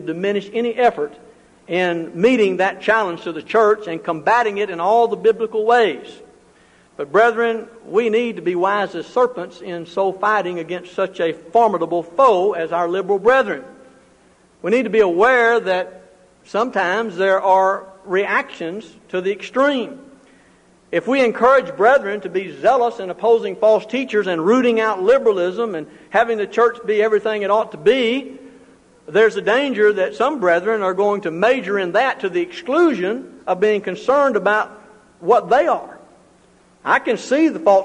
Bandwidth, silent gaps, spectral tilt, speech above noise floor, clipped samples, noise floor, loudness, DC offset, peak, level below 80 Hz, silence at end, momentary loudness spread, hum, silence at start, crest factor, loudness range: 10 kHz; none; -5.5 dB/octave; 35 dB; under 0.1%; -53 dBFS; -18 LUFS; under 0.1%; -2 dBFS; -62 dBFS; 0 s; 10 LU; none; 0 s; 16 dB; 3 LU